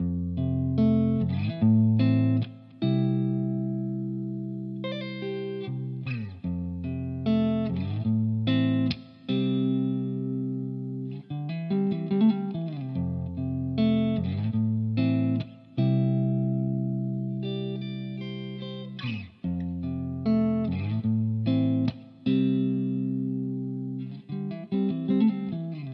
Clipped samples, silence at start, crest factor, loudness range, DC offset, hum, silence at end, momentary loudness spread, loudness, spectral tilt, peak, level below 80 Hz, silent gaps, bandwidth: under 0.1%; 0 s; 14 dB; 6 LU; under 0.1%; none; 0 s; 10 LU; -28 LUFS; -10.5 dB/octave; -12 dBFS; -60 dBFS; none; 5.6 kHz